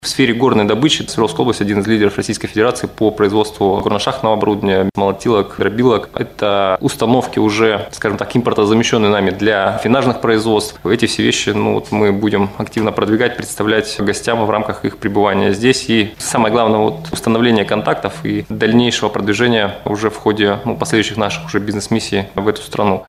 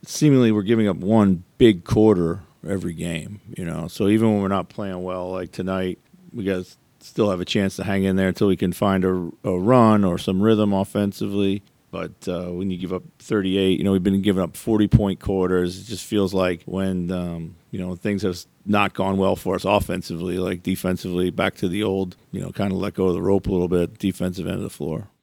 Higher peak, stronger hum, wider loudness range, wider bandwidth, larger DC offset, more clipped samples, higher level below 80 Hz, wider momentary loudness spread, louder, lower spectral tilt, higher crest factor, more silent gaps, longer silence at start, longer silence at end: about the same, 0 dBFS vs 0 dBFS; neither; second, 2 LU vs 5 LU; about the same, 15 kHz vs 16.5 kHz; neither; neither; about the same, -44 dBFS vs -44 dBFS; second, 6 LU vs 13 LU; first, -15 LUFS vs -22 LUFS; second, -5 dB/octave vs -6.5 dB/octave; second, 14 dB vs 20 dB; neither; about the same, 0.05 s vs 0.05 s; about the same, 0.05 s vs 0.15 s